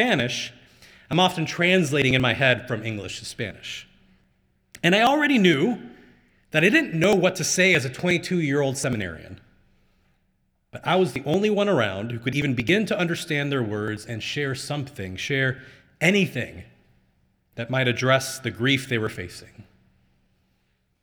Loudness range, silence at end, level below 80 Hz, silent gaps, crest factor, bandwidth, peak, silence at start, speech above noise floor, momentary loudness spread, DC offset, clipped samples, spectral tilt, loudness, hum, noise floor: 6 LU; 1.4 s; -58 dBFS; none; 20 dB; over 20 kHz; -4 dBFS; 0 s; 46 dB; 15 LU; under 0.1%; under 0.1%; -4.5 dB/octave; -22 LUFS; none; -69 dBFS